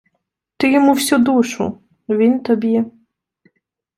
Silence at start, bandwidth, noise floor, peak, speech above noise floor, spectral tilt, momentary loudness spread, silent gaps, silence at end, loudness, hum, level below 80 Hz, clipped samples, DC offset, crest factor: 0.6 s; 16 kHz; -73 dBFS; -2 dBFS; 58 dB; -4.5 dB/octave; 11 LU; none; 1.1 s; -16 LUFS; none; -62 dBFS; under 0.1%; under 0.1%; 16 dB